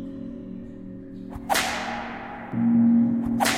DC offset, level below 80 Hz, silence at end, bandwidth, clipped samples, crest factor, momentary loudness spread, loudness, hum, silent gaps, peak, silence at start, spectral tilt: under 0.1%; -50 dBFS; 0 s; 16 kHz; under 0.1%; 18 dB; 20 LU; -23 LUFS; none; none; -8 dBFS; 0 s; -4 dB/octave